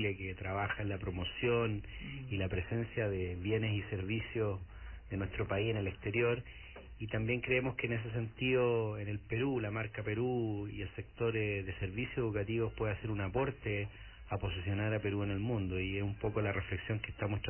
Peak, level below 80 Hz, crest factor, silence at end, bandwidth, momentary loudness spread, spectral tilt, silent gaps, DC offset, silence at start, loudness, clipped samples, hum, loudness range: -20 dBFS; -50 dBFS; 16 dB; 0 s; 3.2 kHz; 8 LU; -5 dB/octave; none; under 0.1%; 0 s; -37 LUFS; under 0.1%; none; 2 LU